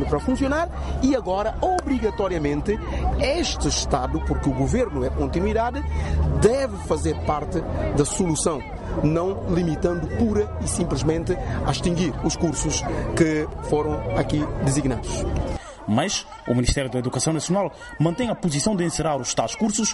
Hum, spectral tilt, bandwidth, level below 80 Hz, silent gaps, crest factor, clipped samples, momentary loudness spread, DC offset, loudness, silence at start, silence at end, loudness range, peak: none; -5 dB/octave; 11.5 kHz; -32 dBFS; none; 16 dB; under 0.1%; 4 LU; under 0.1%; -23 LUFS; 0 s; 0 s; 1 LU; -6 dBFS